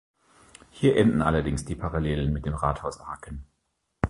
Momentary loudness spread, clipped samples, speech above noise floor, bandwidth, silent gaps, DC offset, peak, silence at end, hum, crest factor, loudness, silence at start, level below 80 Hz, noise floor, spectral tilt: 18 LU; under 0.1%; 51 dB; 11.5 kHz; none; under 0.1%; -4 dBFS; 0 s; none; 22 dB; -26 LUFS; 0.75 s; -38 dBFS; -76 dBFS; -7 dB/octave